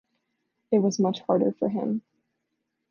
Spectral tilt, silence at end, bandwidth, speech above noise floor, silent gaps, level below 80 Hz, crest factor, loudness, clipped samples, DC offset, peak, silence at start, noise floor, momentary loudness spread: -7 dB/octave; 0.9 s; 7 kHz; 55 dB; none; -76 dBFS; 18 dB; -26 LUFS; under 0.1%; under 0.1%; -8 dBFS; 0.7 s; -80 dBFS; 6 LU